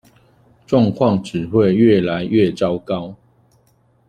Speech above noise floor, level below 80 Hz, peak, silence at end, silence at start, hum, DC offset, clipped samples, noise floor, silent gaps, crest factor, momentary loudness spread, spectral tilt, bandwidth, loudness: 42 dB; -50 dBFS; -2 dBFS; 0.95 s; 0.7 s; none; under 0.1%; under 0.1%; -57 dBFS; none; 16 dB; 11 LU; -8 dB/octave; 9.8 kHz; -17 LUFS